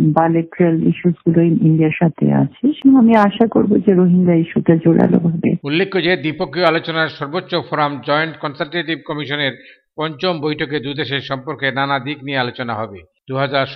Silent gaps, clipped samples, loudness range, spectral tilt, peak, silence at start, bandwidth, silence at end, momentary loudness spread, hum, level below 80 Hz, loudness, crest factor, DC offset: none; under 0.1%; 8 LU; -9 dB/octave; 0 dBFS; 0 s; 5.6 kHz; 0 s; 10 LU; none; -54 dBFS; -16 LUFS; 16 dB; under 0.1%